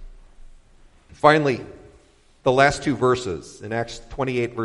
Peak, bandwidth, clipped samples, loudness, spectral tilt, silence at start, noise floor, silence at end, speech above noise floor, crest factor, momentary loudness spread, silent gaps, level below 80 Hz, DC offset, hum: 0 dBFS; 11.5 kHz; under 0.1%; -21 LUFS; -5.5 dB/octave; 0 s; -54 dBFS; 0 s; 34 dB; 22 dB; 14 LU; none; -46 dBFS; under 0.1%; none